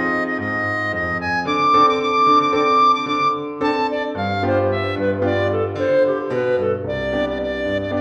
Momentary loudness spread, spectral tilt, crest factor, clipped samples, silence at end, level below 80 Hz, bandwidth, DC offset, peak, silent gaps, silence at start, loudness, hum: 8 LU; -6 dB/octave; 14 dB; under 0.1%; 0 s; -46 dBFS; 8.6 kHz; under 0.1%; -4 dBFS; none; 0 s; -18 LUFS; none